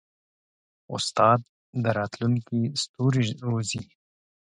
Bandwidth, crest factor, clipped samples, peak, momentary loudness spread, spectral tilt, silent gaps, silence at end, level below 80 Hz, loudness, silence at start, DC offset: 11 kHz; 22 dB; under 0.1%; -4 dBFS; 10 LU; -5.5 dB/octave; 1.49-1.73 s, 2.89-2.94 s; 0.65 s; -62 dBFS; -26 LUFS; 0.9 s; under 0.1%